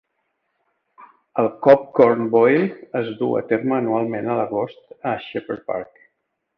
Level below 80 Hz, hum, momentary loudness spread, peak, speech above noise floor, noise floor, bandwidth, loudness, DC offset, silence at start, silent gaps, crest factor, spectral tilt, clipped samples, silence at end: -64 dBFS; none; 14 LU; -2 dBFS; 55 dB; -74 dBFS; 5.6 kHz; -20 LUFS; under 0.1%; 1 s; none; 20 dB; -9 dB/octave; under 0.1%; 0.75 s